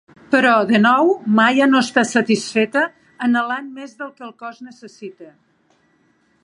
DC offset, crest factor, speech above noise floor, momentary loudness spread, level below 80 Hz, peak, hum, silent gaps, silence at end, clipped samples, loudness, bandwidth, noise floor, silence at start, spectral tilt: under 0.1%; 18 dB; 43 dB; 22 LU; -68 dBFS; 0 dBFS; none; none; 1.15 s; under 0.1%; -16 LUFS; 11.5 kHz; -60 dBFS; 0.3 s; -4.5 dB/octave